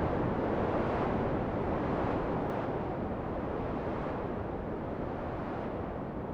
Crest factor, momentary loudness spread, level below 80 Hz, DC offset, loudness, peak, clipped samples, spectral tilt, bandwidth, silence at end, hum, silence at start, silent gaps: 16 dB; 6 LU; -46 dBFS; under 0.1%; -34 LUFS; -18 dBFS; under 0.1%; -9 dB/octave; 8.6 kHz; 0 s; none; 0 s; none